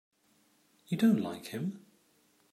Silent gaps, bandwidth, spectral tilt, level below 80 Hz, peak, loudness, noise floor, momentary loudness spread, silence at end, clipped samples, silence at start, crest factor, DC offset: none; 15 kHz; -7 dB/octave; -82 dBFS; -16 dBFS; -32 LUFS; -70 dBFS; 12 LU; 0.75 s; under 0.1%; 0.9 s; 20 dB; under 0.1%